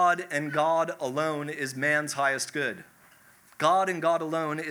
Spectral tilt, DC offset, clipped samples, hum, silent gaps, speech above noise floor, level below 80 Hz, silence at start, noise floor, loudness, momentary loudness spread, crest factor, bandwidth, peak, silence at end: -4 dB/octave; under 0.1%; under 0.1%; none; none; 30 dB; -82 dBFS; 0 s; -57 dBFS; -27 LUFS; 7 LU; 18 dB; over 20 kHz; -10 dBFS; 0 s